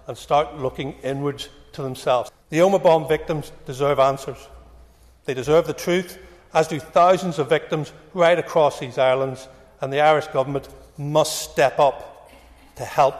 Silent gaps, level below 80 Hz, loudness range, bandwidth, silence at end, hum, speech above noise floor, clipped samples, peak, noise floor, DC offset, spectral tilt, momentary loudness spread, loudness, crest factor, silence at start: none; -50 dBFS; 3 LU; 14 kHz; 0 s; none; 29 dB; under 0.1%; -6 dBFS; -50 dBFS; under 0.1%; -5 dB/octave; 15 LU; -21 LUFS; 14 dB; 0.1 s